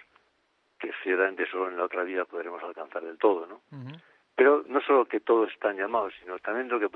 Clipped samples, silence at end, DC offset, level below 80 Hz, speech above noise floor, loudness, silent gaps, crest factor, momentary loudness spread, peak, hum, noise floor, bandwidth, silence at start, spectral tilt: under 0.1%; 0.05 s; under 0.1%; -78 dBFS; 43 dB; -27 LUFS; none; 20 dB; 15 LU; -8 dBFS; none; -71 dBFS; 4.2 kHz; 0.8 s; -8 dB/octave